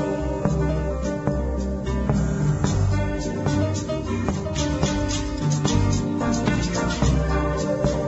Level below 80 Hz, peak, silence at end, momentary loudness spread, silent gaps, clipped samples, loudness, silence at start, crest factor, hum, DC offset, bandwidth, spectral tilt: -30 dBFS; -6 dBFS; 0 s; 4 LU; none; under 0.1%; -24 LUFS; 0 s; 16 dB; none; under 0.1%; 8.2 kHz; -6 dB/octave